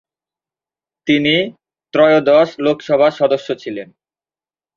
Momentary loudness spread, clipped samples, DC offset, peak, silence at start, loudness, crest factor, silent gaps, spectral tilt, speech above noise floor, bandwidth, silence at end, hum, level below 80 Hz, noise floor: 14 LU; under 0.1%; under 0.1%; 0 dBFS; 1.05 s; -15 LUFS; 16 dB; none; -6 dB/octave; over 76 dB; 7.2 kHz; 0.9 s; none; -60 dBFS; under -90 dBFS